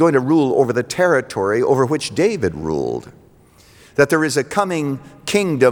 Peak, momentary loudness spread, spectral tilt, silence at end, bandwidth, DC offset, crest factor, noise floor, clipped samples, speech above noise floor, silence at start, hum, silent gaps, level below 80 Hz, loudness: -2 dBFS; 8 LU; -5.5 dB/octave; 0 s; over 20 kHz; under 0.1%; 16 dB; -49 dBFS; under 0.1%; 32 dB; 0 s; none; none; -52 dBFS; -18 LUFS